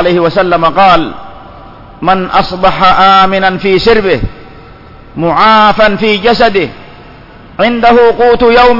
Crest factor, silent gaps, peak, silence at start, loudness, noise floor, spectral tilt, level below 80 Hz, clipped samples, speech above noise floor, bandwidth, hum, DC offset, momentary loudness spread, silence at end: 8 dB; none; 0 dBFS; 0 s; -7 LUFS; -33 dBFS; -6.5 dB/octave; -30 dBFS; 0.7%; 26 dB; 6 kHz; none; under 0.1%; 11 LU; 0 s